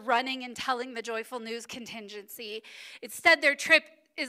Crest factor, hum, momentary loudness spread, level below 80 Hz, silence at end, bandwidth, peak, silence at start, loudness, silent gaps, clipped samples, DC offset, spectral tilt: 22 dB; none; 20 LU; -74 dBFS; 0 s; 16 kHz; -8 dBFS; 0 s; -26 LUFS; none; under 0.1%; under 0.1%; -1 dB/octave